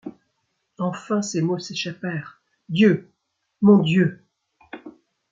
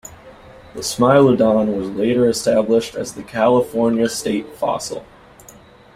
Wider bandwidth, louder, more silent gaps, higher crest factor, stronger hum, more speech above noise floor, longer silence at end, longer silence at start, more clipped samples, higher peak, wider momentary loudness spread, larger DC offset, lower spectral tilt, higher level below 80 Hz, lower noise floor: second, 7.8 kHz vs 16 kHz; second, -21 LUFS vs -17 LUFS; neither; about the same, 20 dB vs 16 dB; neither; first, 55 dB vs 28 dB; second, 0.4 s vs 0.9 s; about the same, 0.05 s vs 0.05 s; neither; about the same, -4 dBFS vs -2 dBFS; first, 24 LU vs 14 LU; neither; about the same, -6 dB/octave vs -5.5 dB/octave; second, -66 dBFS vs -52 dBFS; first, -75 dBFS vs -44 dBFS